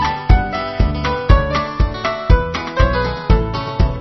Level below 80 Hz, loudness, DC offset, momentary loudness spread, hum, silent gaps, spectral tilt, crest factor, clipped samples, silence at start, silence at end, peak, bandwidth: -18 dBFS; -17 LUFS; 0.8%; 6 LU; none; none; -7 dB/octave; 16 dB; 0.2%; 0 s; 0 s; 0 dBFS; 6.2 kHz